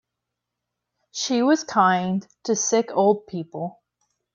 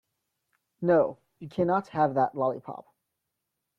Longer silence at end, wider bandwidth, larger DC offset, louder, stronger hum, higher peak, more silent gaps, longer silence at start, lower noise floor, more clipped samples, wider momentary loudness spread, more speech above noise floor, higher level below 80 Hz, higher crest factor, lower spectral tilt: second, 0.6 s vs 1 s; about the same, 7.6 kHz vs 7 kHz; neither; first, -22 LUFS vs -27 LUFS; first, 60 Hz at -45 dBFS vs none; first, -6 dBFS vs -12 dBFS; neither; first, 1.15 s vs 0.8 s; about the same, -83 dBFS vs -83 dBFS; neither; second, 14 LU vs 18 LU; first, 61 dB vs 57 dB; about the same, -70 dBFS vs -70 dBFS; about the same, 18 dB vs 18 dB; second, -4 dB/octave vs -9 dB/octave